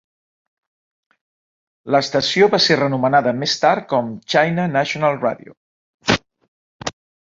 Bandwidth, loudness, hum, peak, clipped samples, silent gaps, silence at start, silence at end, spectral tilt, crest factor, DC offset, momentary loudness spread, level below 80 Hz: 7.8 kHz; -17 LUFS; none; 0 dBFS; under 0.1%; 5.57-5.99 s, 6.48-6.79 s; 1.85 s; 0.4 s; -4.5 dB/octave; 20 dB; under 0.1%; 13 LU; -56 dBFS